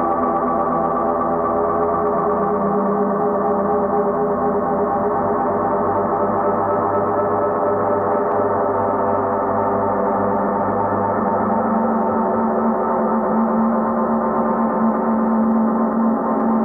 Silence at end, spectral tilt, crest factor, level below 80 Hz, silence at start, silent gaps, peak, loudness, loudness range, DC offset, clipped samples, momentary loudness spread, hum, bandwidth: 0 s; -11.5 dB/octave; 12 dB; -48 dBFS; 0 s; none; -6 dBFS; -18 LUFS; 1 LU; under 0.1%; under 0.1%; 1 LU; none; 2.7 kHz